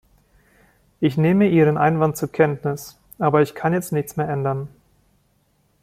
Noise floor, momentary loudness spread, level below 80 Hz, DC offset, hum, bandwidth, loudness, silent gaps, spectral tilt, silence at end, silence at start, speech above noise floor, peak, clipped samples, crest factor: -63 dBFS; 12 LU; -56 dBFS; under 0.1%; none; 16 kHz; -20 LUFS; none; -7.5 dB/octave; 1.15 s; 1 s; 44 dB; -2 dBFS; under 0.1%; 18 dB